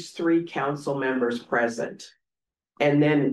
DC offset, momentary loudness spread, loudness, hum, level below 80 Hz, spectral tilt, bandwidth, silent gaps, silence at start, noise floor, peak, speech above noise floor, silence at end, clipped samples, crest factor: under 0.1%; 10 LU; -25 LUFS; none; -72 dBFS; -6.5 dB/octave; 12 kHz; none; 0 s; -90 dBFS; -10 dBFS; 66 dB; 0 s; under 0.1%; 16 dB